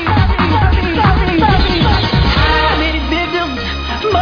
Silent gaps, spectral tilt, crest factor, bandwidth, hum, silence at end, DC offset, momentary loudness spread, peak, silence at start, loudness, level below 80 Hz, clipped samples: none; -7 dB/octave; 12 dB; 5.4 kHz; none; 0 s; under 0.1%; 6 LU; 0 dBFS; 0 s; -13 LUFS; -18 dBFS; under 0.1%